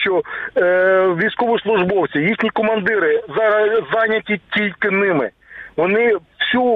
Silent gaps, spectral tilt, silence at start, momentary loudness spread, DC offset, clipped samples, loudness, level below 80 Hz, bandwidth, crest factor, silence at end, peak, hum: none; -8 dB/octave; 0 s; 6 LU; under 0.1%; under 0.1%; -17 LUFS; -56 dBFS; 4.9 kHz; 12 dB; 0 s; -4 dBFS; none